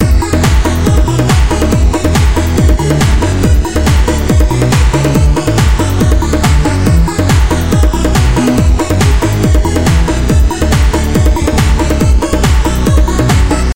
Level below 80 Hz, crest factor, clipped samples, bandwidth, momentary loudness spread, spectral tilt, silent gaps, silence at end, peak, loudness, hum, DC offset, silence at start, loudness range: -12 dBFS; 8 dB; under 0.1%; 17 kHz; 1 LU; -6 dB/octave; none; 0 s; 0 dBFS; -10 LUFS; none; 3%; 0 s; 0 LU